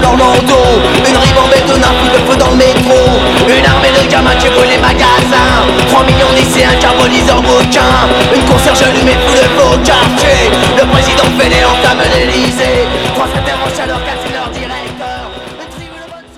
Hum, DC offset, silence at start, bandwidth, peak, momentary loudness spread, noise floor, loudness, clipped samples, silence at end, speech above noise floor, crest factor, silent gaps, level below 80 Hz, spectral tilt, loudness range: none; under 0.1%; 0 s; 16.5 kHz; 0 dBFS; 11 LU; -29 dBFS; -7 LUFS; 1%; 0.15 s; 22 dB; 8 dB; none; -20 dBFS; -4 dB/octave; 5 LU